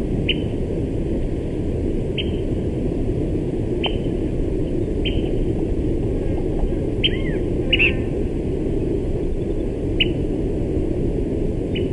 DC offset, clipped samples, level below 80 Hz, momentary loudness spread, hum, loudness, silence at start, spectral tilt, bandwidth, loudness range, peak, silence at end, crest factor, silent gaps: under 0.1%; under 0.1%; -26 dBFS; 4 LU; none; -22 LUFS; 0 s; -7.5 dB/octave; 11 kHz; 2 LU; -4 dBFS; 0 s; 16 dB; none